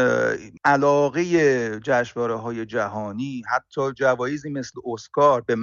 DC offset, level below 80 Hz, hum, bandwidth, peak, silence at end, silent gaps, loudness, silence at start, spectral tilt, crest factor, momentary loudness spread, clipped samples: under 0.1%; -60 dBFS; none; 7.4 kHz; -6 dBFS; 0 s; none; -22 LUFS; 0 s; -5 dB/octave; 16 dB; 11 LU; under 0.1%